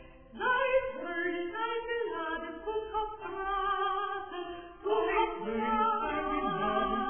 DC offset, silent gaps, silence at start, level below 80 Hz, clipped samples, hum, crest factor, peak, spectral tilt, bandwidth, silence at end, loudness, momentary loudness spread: 0.2%; none; 0 s; -54 dBFS; under 0.1%; none; 16 dB; -16 dBFS; -8 dB/octave; 3.5 kHz; 0 s; -32 LUFS; 9 LU